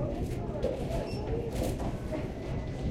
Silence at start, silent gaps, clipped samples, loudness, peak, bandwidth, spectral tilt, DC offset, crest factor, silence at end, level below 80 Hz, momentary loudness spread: 0 s; none; under 0.1%; -35 LUFS; -16 dBFS; 16 kHz; -7 dB/octave; under 0.1%; 16 dB; 0 s; -40 dBFS; 3 LU